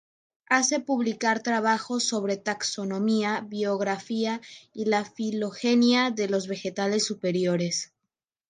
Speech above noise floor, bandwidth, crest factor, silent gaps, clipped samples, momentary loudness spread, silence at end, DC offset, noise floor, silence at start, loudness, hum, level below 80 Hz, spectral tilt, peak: 59 dB; 9.8 kHz; 20 dB; none; under 0.1%; 7 LU; 0.65 s; under 0.1%; -85 dBFS; 0.5 s; -26 LUFS; none; -76 dBFS; -3.5 dB/octave; -8 dBFS